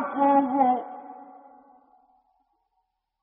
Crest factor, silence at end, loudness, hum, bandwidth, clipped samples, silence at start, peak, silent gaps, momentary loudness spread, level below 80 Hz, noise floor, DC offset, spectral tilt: 18 dB; 2 s; -23 LUFS; none; 3.6 kHz; under 0.1%; 0 s; -10 dBFS; none; 23 LU; -76 dBFS; -77 dBFS; under 0.1%; -5 dB/octave